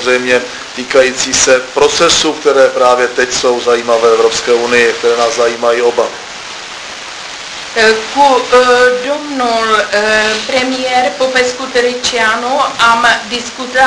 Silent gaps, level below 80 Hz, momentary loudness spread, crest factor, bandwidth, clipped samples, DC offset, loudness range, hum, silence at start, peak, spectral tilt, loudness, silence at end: none; -46 dBFS; 14 LU; 12 dB; 11 kHz; 0.3%; under 0.1%; 3 LU; none; 0 s; 0 dBFS; -1.5 dB/octave; -10 LUFS; 0 s